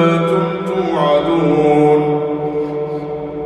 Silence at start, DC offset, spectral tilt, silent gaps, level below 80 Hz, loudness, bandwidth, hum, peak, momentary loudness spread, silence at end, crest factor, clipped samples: 0 s; under 0.1%; -8 dB/octave; none; -46 dBFS; -15 LUFS; 10 kHz; none; -2 dBFS; 10 LU; 0 s; 14 dB; under 0.1%